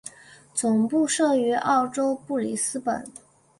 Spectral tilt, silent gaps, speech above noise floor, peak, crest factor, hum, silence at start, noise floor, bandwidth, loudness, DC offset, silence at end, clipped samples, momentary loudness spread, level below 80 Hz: -3.5 dB/octave; none; 26 dB; -10 dBFS; 14 dB; none; 0.05 s; -50 dBFS; 11.5 kHz; -24 LUFS; under 0.1%; 0.5 s; under 0.1%; 10 LU; -68 dBFS